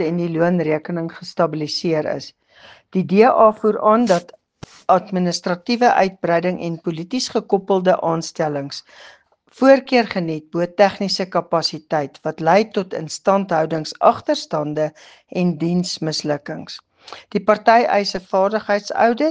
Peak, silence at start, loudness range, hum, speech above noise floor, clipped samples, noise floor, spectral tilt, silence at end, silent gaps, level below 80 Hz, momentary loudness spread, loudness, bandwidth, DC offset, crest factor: 0 dBFS; 0 s; 4 LU; none; 24 dB; under 0.1%; -43 dBFS; -5.5 dB/octave; 0 s; none; -62 dBFS; 12 LU; -19 LUFS; 9.6 kHz; under 0.1%; 18 dB